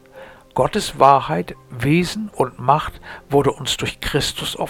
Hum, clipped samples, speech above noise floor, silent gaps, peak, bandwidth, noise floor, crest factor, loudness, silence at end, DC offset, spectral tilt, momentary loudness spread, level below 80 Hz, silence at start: none; under 0.1%; 23 dB; none; 0 dBFS; 18.5 kHz; -42 dBFS; 20 dB; -19 LUFS; 0 s; under 0.1%; -5 dB/octave; 11 LU; -42 dBFS; 0.15 s